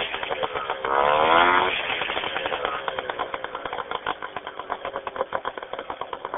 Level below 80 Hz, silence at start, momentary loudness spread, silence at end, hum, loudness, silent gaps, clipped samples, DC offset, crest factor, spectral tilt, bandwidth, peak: -54 dBFS; 0 s; 15 LU; 0 s; none; -25 LUFS; none; under 0.1%; under 0.1%; 24 dB; 2.5 dB/octave; 3.9 kHz; -2 dBFS